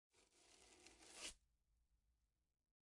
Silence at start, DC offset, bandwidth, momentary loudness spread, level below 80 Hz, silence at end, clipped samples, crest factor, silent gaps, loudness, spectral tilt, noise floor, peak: 0.15 s; under 0.1%; 12 kHz; 13 LU; -82 dBFS; 0.65 s; under 0.1%; 26 dB; none; -59 LUFS; 0 dB/octave; -87 dBFS; -40 dBFS